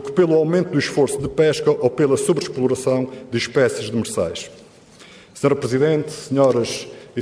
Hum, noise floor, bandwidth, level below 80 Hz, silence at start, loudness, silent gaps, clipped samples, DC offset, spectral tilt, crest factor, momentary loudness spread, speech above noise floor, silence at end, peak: none; -45 dBFS; 11 kHz; -54 dBFS; 0 s; -19 LUFS; none; under 0.1%; under 0.1%; -5.5 dB/octave; 16 dB; 8 LU; 27 dB; 0 s; -4 dBFS